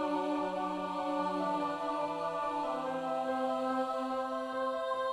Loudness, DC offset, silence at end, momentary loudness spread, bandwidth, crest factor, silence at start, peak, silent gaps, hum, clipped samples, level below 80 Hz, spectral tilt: -35 LUFS; under 0.1%; 0 s; 2 LU; 14 kHz; 12 dB; 0 s; -22 dBFS; none; none; under 0.1%; -72 dBFS; -5.5 dB/octave